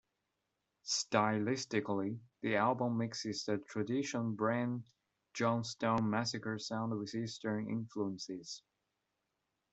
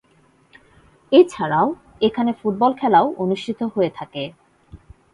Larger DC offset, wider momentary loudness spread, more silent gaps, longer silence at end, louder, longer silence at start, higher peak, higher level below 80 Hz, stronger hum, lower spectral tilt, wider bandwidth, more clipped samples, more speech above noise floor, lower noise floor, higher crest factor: neither; second, 10 LU vs 13 LU; neither; first, 1.15 s vs 0.4 s; second, -37 LUFS vs -19 LUFS; second, 0.85 s vs 1.1 s; second, -14 dBFS vs -2 dBFS; second, -76 dBFS vs -56 dBFS; neither; second, -5 dB/octave vs -6.5 dB/octave; second, 8.2 kHz vs 11 kHz; neither; first, 49 dB vs 39 dB; first, -86 dBFS vs -57 dBFS; first, 24 dB vs 18 dB